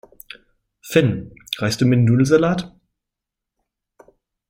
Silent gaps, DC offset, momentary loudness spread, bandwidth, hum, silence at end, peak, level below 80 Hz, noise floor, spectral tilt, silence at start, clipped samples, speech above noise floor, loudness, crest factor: none; under 0.1%; 24 LU; 16.5 kHz; none; 1.85 s; -2 dBFS; -52 dBFS; -84 dBFS; -6.5 dB/octave; 0.85 s; under 0.1%; 67 dB; -18 LUFS; 20 dB